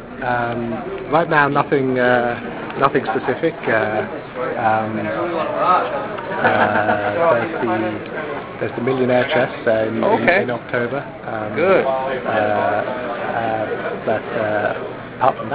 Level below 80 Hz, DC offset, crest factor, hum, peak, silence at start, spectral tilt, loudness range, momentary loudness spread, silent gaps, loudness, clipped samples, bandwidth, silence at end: -50 dBFS; under 0.1%; 18 dB; none; -2 dBFS; 0 s; -9.5 dB/octave; 2 LU; 10 LU; none; -19 LUFS; under 0.1%; 4 kHz; 0 s